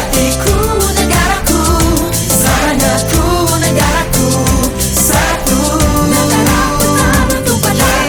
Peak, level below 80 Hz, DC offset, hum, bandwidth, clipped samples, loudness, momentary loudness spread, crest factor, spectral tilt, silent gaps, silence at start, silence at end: 0 dBFS; -20 dBFS; under 0.1%; none; 20 kHz; under 0.1%; -11 LUFS; 2 LU; 10 dB; -4 dB/octave; none; 0 s; 0 s